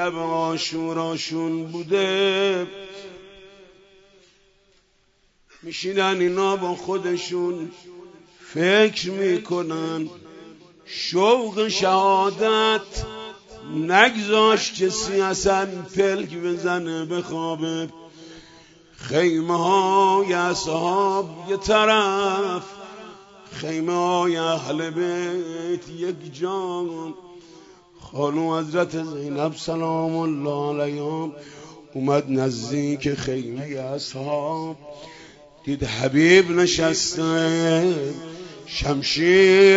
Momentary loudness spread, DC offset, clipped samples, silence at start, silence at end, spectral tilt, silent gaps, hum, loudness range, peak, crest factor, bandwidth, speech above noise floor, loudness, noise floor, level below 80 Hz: 17 LU; under 0.1%; under 0.1%; 0 s; 0 s; -4.5 dB/octave; none; none; 8 LU; 0 dBFS; 22 dB; 8 kHz; 41 dB; -22 LUFS; -62 dBFS; -50 dBFS